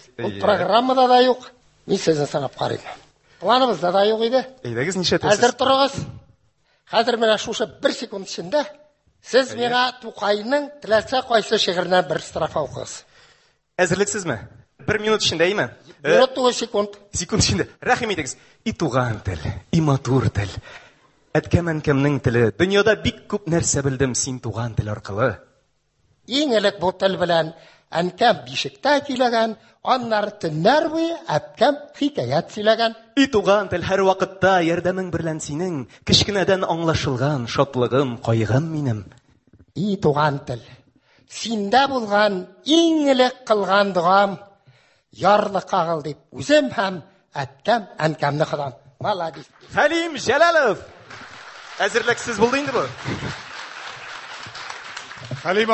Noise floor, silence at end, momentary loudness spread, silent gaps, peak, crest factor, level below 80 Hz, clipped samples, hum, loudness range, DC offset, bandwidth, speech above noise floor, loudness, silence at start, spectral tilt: -65 dBFS; 0 s; 14 LU; none; -2 dBFS; 18 dB; -46 dBFS; under 0.1%; none; 4 LU; under 0.1%; 8.6 kHz; 45 dB; -20 LUFS; 0.2 s; -4.5 dB/octave